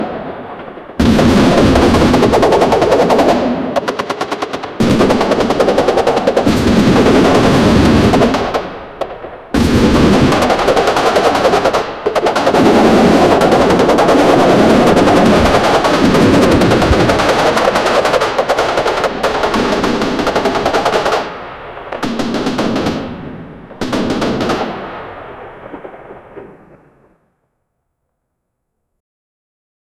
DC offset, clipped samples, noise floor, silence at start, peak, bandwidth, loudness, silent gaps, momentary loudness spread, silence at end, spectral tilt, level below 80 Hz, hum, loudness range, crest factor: under 0.1%; under 0.1%; -71 dBFS; 0 s; 0 dBFS; 15.5 kHz; -11 LUFS; none; 16 LU; 3.55 s; -5.5 dB/octave; -30 dBFS; none; 10 LU; 12 dB